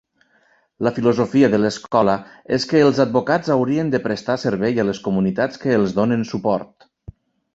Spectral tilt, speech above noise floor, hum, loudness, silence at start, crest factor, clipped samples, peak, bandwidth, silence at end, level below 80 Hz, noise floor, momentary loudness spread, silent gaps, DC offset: -6.5 dB/octave; 41 dB; none; -19 LUFS; 0.8 s; 18 dB; under 0.1%; -2 dBFS; 8 kHz; 0.9 s; -54 dBFS; -59 dBFS; 7 LU; none; under 0.1%